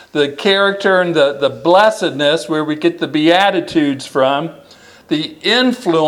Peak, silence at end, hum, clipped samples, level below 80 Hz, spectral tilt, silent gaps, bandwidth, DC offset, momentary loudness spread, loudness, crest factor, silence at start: 0 dBFS; 0 s; none; under 0.1%; -60 dBFS; -4.5 dB/octave; none; 14 kHz; under 0.1%; 7 LU; -14 LUFS; 14 dB; 0.15 s